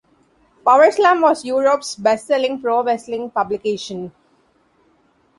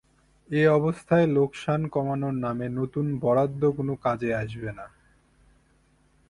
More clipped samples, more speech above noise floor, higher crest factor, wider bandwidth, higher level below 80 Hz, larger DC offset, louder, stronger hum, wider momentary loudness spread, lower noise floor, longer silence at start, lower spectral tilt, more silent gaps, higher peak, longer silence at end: neither; first, 42 dB vs 38 dB; about the same, 16 dB vs 18 dB; about the same, 11.5 kHz vs 11 kHz; second, -64 dBFS vs -56 dBFS; neither; first, -17 LUFS vs -25 LUFS; neither; about the same, 12 LU vs 10 LU; second, -59 dBFS vs -63 dBFS; first, 0.65 s vs 0.5 s; second, -4 dB/octave vs -8.5 dB/octave; neither; first, -2 dBFS vs -8 dBFS; about the same, 1.3 s vs 1.4 s